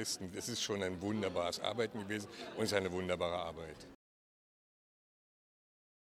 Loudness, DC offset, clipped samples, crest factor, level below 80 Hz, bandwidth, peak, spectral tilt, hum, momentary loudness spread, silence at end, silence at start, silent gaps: -38 LUFS; under 0.1%; under 0.1%; 24 dB; -68 dBFS; 16.5 kHz; -16 dBFS; -3.5 dB/octave; none; 11 LU; 2.05 s; 0 s; none